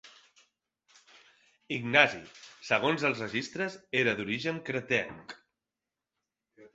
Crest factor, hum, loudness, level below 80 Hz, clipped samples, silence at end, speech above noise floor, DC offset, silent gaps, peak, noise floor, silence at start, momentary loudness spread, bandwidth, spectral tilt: 28 dB; none; -29 LUFS; -70 dBFS; under 0.1%; 0.05 s; 59 dB; under 0.1%; none; -4 dBFS; -89 dBFS; 0.05 s; 23 LU; 8.2 kHz; -4.5 dB/octave